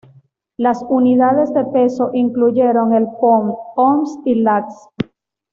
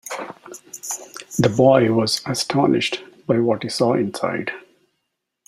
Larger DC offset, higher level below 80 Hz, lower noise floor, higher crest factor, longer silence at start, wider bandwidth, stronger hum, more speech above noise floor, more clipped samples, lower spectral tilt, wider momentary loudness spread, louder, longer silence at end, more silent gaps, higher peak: neither; about the same, -58 dBFS vs -58 dBFS; second, -51 dBFS vs -77 dBFS; second, 12 dB vs 18 dB; first, 0.6 s vs 0.05 s; second, 7.2 kHz vs 15.5 kHz; neither; second, 36 dB vs 57 dB; neither; first, -8 dB/octave vs -5 dB/octave; second, 10 LU vs 17 LU; first, -15 LUFS vs -20 LUFS; second, 0.5 s vs 0.9 s; neither; about the same, -4 dBFS vs -2 dBFS